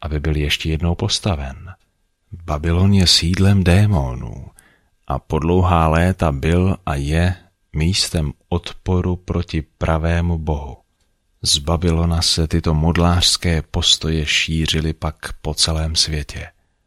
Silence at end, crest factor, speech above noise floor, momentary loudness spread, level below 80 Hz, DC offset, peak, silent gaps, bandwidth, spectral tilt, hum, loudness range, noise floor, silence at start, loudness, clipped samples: 0.35 s; 18 dB; 46 dB; 13 LU; -28 dBFS; under 0.1%; 0 dBFS; none; 14 kHz; -4.5 dB/octave; none; 4 LU; -64 dBFS; 0 s; -18 LUFS; under 0.1%